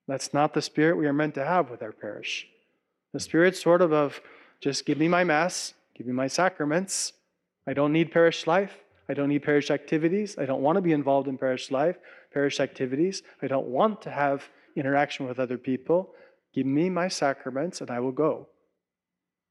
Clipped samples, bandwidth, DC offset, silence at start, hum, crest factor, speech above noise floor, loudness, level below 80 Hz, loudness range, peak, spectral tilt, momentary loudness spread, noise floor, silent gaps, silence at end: under 0.1%; 13 kHz; under 0.1%; 0.1 s; none; 18 dB; 62 dB; -26 LUFS; -78 dBFS; 3 LU; -8 dBFS; -5 dB/octave; 12 LU; -88 dBFS; none; 1.05 s